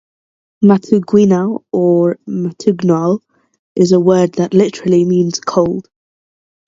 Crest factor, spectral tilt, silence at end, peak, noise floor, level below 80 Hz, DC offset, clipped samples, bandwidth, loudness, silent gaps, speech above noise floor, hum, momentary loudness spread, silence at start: 14 dB; -7 dB/octave; 0.85 s; 0 dBFS; under -90 dBFS; -54 dBFS; under 0.1%; under 0.1%; 7.8 kHz; -13 LUFS; 3.59-3.75 s; over 78 dB; none; 7 LU; 0.6 s